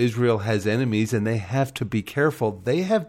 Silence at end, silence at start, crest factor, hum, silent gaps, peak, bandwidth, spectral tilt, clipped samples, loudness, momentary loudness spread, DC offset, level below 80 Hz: 0 s; 0 s; 14 dB; none; none; -8 dBFS; 16.5 kHz; -6.5 dB/octave; under 0.1%; -24 LUFS; 4 LU; under 0.1%; -58 dBFS